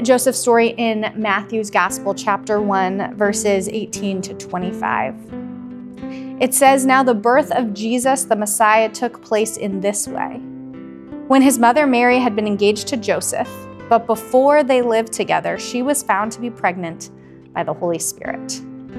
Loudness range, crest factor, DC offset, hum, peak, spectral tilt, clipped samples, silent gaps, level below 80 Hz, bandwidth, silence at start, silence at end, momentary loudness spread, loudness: 6 LU; 18 dB; under 0.1%; none; 0 dBFS; -3.5 dB/octave; under 0.1%; none; -56 dBFS; 15 kHz; 0 s; 0 s; 17 LU; -17 LUFS